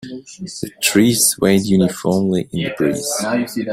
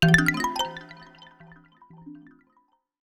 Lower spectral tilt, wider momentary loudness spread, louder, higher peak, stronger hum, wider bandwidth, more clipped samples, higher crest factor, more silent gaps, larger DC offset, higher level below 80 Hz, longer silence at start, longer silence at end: about the same, -4 dB/octave vs -4.5 dB/octave; second, 15 LU vs 29 LU; first, -16 LUFS vs -23 LUFS; about the same, 0 dBFS vs -2 dBFS; neither; about the same, 16 kHz vs 16 kHz; neither; second, 18 dB vs 26 dB; neither; neither; about the same, -50 dBFS vs -48 dBFS; about the same, 0 s vs 0 s; second, 0 s vs 0.85 s